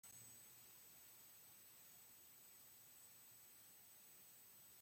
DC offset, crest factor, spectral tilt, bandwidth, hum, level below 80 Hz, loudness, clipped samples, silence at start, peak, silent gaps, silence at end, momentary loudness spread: under 0.1%; 16 dB; -1 dB/octave; 16.5 kHz; none; under -90 dBFS; -62 LUFS; under 0.1%; 0.05 s; -50 dBFS; none; 0 s; 2 LU